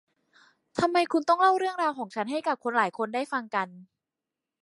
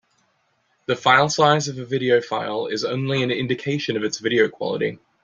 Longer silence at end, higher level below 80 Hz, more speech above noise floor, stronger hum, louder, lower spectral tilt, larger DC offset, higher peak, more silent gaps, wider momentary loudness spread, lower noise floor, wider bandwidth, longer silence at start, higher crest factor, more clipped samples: first, 0.8 s vs 0.3 s; second, -70 dBFS vs -62 dBFS; first, 62 dB vs 46 dB; neither; second, -27 LUFS vs -21 LUFS; about the same, -4.5 dB/octave vs -4.5 dB/octave; neither; second, -10 dBFS vs -2 dBFS; neither; about the same, 10 LU vs 9 LU; first, -88 dBFS vs -67 dBFS; first, 11.5 kHz vs 7.6 kHz; second, 0.75 s vs 0.9 s; about the same, 20 dB vs 20 dB; neither